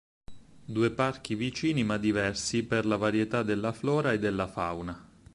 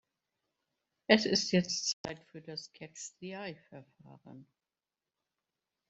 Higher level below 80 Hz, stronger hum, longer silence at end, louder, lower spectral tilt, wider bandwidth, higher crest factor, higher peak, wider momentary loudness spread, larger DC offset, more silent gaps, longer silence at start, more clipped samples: first, -54 dBFS vs -74 dBFS; neither; second, 0.3 s vs 1.45 s; first, -29 LUFS vs -32 LUFS; first, -5.5 dB/octave vs -3.5 dB/octave; first, 11.5 kHz vs 8.2 kHz; second, 16 dB vs 30 dB; second, -12 dBFS vs -8 dBFS; second, 7 LU vs 22 LU; neither; second, none vs 1.93-2.04 s; second, 0.3 s vs 1.1 s; neither